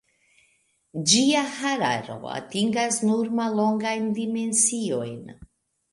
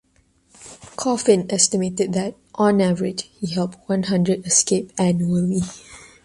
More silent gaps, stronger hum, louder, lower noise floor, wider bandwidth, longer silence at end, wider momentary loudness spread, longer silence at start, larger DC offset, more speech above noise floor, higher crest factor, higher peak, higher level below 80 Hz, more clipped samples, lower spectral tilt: neither; neither; second, -23 LUFS vs -20 LUFS; first, -66 dBFS vs -60 dBFS; about the same, 11.5 kHz vs 11.5 kHz; first, 0.45 s vs 0.2 s; about the same, 13 LU vs 11 LU; first, 0.95 s vs 0.6 s; neither; about the same, 42 dB vs 40 dB; about the same, 20 dB vs 18 dB; about the same, -4 dBFS vs -2 dBFS; second, -64 dBFS vs -54 dBFS; neither; second, -3 dB/octave vs -4.5 dB/octave